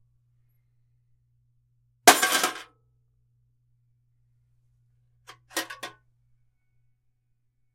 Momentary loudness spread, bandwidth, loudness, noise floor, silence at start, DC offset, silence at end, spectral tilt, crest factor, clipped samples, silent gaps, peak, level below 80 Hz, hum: 24 LU; 16 kHz; -22 LUFS; -72 dBFS; 2.05 s; under 0.1%; 1.85 s; 0 dB/octave; 30 dB; under 0.1%; none; -2 dBFS; -72 dBFS; none